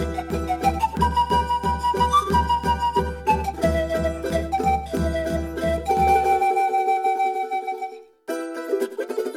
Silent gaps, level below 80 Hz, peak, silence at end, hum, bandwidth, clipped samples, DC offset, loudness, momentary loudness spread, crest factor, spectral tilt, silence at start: none; -36 dBFS; -8 dBFS; 0 s; none; 17 kHz; under 0.1%; under 0.1%; -22 LUFS; 9 LU; 16 dB; -5.5 dB/octave; 0 s